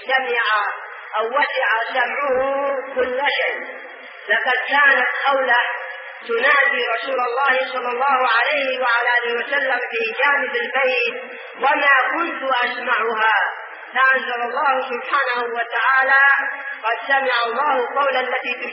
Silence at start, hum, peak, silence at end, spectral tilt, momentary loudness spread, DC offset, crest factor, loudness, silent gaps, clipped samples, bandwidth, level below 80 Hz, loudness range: 0 s; none; -4 dBFS; 0 s; 3 dB/octave; 10 LU; under 0.1%; 16 dB; -18 LUFS; none; under 0.1%; 5.8 kHz; -70 dBFS; 3 LU